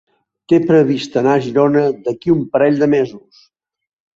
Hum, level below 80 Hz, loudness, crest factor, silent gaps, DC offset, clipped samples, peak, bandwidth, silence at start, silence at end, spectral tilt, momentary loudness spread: none; -56 dBFS; -15 LUFS; 14 dB; none; under 0.1%; under 0.1%; -2 dBFS; 7.6 kHz; 0.5 s; 1 s; -7.5 dB/octave; 5 LU